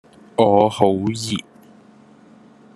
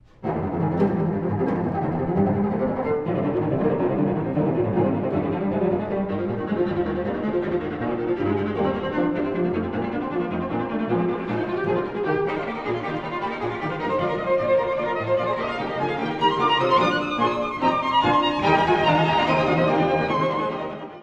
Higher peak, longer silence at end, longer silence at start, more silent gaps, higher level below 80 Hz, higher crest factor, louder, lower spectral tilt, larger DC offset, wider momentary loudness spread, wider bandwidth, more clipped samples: first, 0 dBFS vs -6 dBFS; first, 1.4 s vs 0 s; first, 0.4 s vs 0.2 s; neither; second, -60 dBFS vs -50 dBFS; about the same, 20 dB vs 16 dB; first, -18 LUFS vs -23 LUFS; second, -6 dB/octave vs -7.5 dB/octave; neither; first, 12 LU vs 7 LU; first, 12.5 kHz vs 8 kHz; neither